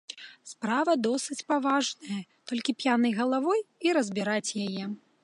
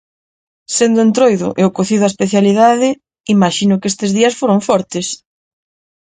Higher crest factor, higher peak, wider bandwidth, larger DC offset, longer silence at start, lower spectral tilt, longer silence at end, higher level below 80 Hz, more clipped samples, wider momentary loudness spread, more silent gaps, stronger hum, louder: about the same, 16 dB vs 14 dB; second, -14 dBFS vs 0 dBFS; first, 11.5 kHz vs 9.6 kHz; neither; second, 0.1 s vs 0.7 s; about the same, -4 dB/octave vs -5 dB/octave; second, 0.25 s vs 0.9 s; second, -82 dBFS vs -56 dBFS; neither; about the same, 12 LU vs 10 LU; second, none vs 3.20-3.24 s; neither; second, -28 LUFS vs -13 LUFS